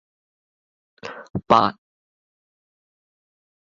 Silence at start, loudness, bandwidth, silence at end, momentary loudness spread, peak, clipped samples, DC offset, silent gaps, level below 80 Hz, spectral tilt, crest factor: 1.05 s; -19 LUFS; 7.6 kHz; 2.05 s; 20 LU; -2 dBFS; under 0.1%; under 0.1%; 1.30-1.34 s; -58 dBFS; -6 dB/octave; 26 dB